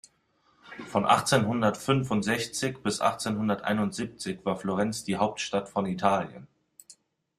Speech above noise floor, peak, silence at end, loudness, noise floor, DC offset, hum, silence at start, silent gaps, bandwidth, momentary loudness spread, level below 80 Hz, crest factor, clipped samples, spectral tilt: 40 dB; -8 dBFS; 0.45 s; -28 LUFS; -68 dBFS; under 0.1%; none; 0.65 s; none; 15 kHz; 8 LU; -62 dBFS; 20 dB; under 0.1%; -5 dB/octave